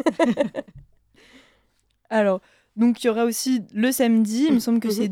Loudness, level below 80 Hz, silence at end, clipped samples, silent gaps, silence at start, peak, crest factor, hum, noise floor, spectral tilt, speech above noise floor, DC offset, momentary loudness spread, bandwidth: -21 LUFS; -62 dBFS; 0 s; under 0.1%; none; 0.05 s; -6 dBFS; 18 dB; none; -66 dBFS; -5 dB/octave; 45 dB; under 0.1%; 7 LU; 16.5 kHz